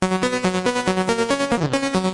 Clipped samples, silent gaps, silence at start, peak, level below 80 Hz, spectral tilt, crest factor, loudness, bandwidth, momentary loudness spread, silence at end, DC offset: under 0.1%; none; 0 s; -2 dBFS; -50 dBFS; -5 dB/octave; 18 dB; -21 LUFS; 11.5 kHz; 1 LU; 0 s; under 0.1%